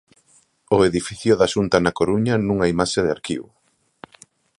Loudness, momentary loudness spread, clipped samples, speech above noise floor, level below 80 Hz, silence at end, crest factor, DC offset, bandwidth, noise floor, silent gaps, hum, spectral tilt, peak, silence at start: -20 LUFS; 6 LU; under 0.1%; 39 dB; -46 dBFS; 1.2 s; 20 dB; under 0.1%; 11.5 kHz; -58 dBFS; none; none; -5.5 dB/octave; 0 dBFS; 0.7 s